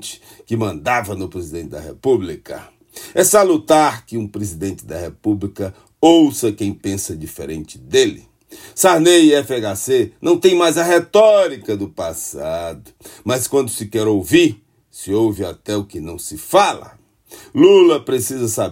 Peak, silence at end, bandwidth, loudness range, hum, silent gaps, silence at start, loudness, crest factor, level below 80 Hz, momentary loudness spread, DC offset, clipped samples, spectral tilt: 0 dBFS; 0 s; 16.5 kHz; 5 LU; none; none; 0 s; -16 LUFS; 16 dB; -52 dBFS; 18 LU; under 0.1%; under 0.1%; -4 dB/octave